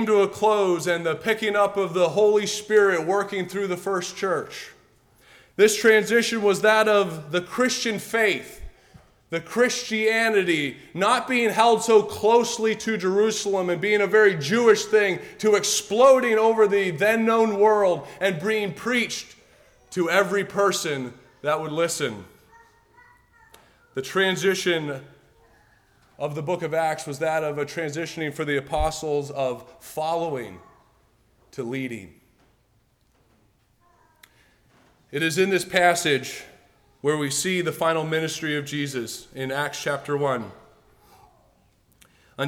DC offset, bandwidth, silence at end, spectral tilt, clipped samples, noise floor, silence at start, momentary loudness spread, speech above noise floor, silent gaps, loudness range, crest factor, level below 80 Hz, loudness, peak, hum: under 0.1%; 17 kHz; 0 s; -3.5 dB/octave; under 0.1%; -64 dBFS; 0 s; 13 LU; 42 dB; none; 11 LU; 18 dB; -52 dBFS; -22 LUFS; -6 dBFS; none